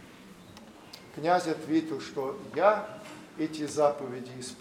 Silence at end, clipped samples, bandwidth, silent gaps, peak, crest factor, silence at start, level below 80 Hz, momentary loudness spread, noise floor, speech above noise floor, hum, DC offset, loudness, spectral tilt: 0 s; under 0.1%; 15.5 kHz; none; -8 dBFS; 22 dB; 0 s; -70 dBFS; 24 LU; -50 dBFS; 21 dB; none; under 0.1%; -30 LUFS; -5 dB/octave